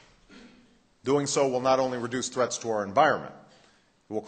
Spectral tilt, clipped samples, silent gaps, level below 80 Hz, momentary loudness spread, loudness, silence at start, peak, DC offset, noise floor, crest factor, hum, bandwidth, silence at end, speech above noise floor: -4 dB/octave; under 0.1%; none; -66 dBFS; 11 LU; -26 LUFS; 0.3 s; -8 dBFS; under 0.1%; -62 dBFS; 20 dB; none; 9.2 kHz; 0 s; 36 dB